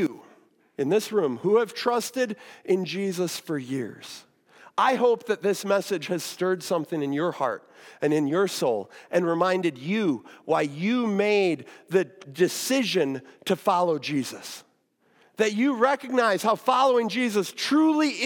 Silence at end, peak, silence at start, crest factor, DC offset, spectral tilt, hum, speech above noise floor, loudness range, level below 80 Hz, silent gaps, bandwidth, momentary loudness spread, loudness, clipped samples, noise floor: 0 s; -8 dBFS; 0 s; 18 dB; under 0.1%; -4.5 dB/octave; none; 42 dB; 3 LU; -84 dBFS; none; 18 kHz; 10 LU; -25 LUFS; under 0.1%; -66 dBFS